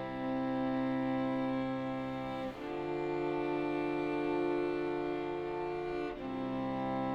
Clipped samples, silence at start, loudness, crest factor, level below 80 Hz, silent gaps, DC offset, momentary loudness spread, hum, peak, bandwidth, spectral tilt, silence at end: under 0.1%; 0 s; -36 LUFS; 12 dB; -60 dBFS; none; under 0.1%; 5 LU; none; -22 dBFS; 8 kHz; -8 dB/octave; 0 s